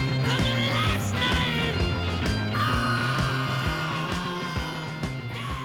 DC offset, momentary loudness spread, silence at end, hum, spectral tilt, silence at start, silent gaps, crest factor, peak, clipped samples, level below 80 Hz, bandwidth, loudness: under 0.1%; 8 LU; 0 s; none; -5 dB/octave; 0 s; none; 14 dB; -10 dBFS; under 0.1%; -38 dBFS; 17.5 kHz; -26 LUFS